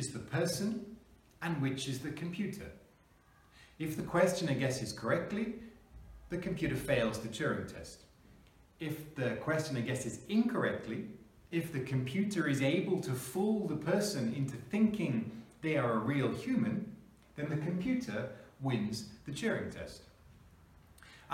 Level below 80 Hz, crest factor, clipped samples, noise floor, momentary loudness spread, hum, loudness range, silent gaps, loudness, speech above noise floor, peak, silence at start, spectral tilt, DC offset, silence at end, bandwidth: -62 dBFS; 20 dB; under 0.1%; -65 dBFS; 14 LU; none; 5 LU; none; -35 LUFS; 30 dB; -16 dBFS; 0 s; -6 dB/octave; under 0.1%; 0 s; 16.5 kHz